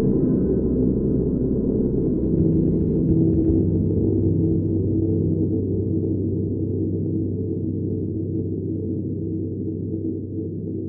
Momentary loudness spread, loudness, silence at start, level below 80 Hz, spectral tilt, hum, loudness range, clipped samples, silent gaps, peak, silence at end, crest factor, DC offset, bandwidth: 8 LU; -22 LUFS; 0 s; -34 dBFS; -16.5 dB/octave; none; 6 LU; under 0.1%; none; -8 dBFS; 0 s; 14 dB; under 0.1%; 1.6 kHz